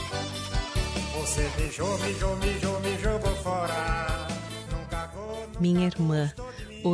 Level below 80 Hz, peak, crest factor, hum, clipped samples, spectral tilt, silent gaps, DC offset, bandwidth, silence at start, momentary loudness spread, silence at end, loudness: -36 dBFS; -14 dBFS; 14 dB; none; under 0.1%; -5 dB/octave; none; under 0.1%; 11 kHz; 0 s; 10 LU; 0 s; -29 LUFS